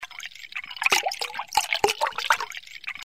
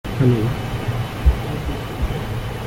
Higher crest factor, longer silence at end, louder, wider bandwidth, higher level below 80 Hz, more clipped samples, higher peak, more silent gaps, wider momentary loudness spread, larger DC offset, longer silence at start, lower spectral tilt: first, 22 dB vs 16 dB; about the same, 0 s vs 0 s; second, -25 LUFS vs -22 LUFS; about the same, 16 kHz vs 17 kHz; second, -62 dBFS vs -26 dBFS; neither; about the same, -6 dBFS vs -4 dBFS; neither; first, 14 LU vs 8 LU; first, 0.2% vs under 0.1%; about the same, 0 s vs 0.05 s; second, 0.5 dB/octave vs -7 dB/octave